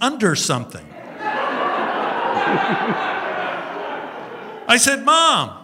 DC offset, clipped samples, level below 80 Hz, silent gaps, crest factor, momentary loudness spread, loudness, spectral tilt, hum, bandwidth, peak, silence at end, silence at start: under 0.1%; under 0.1%; -64 dBFS; none; 20 dB; 18 LU; -18 LUFS; -2.5 dB/octave; none; 16 kHz; 0 dBFS; 0 s; 0 s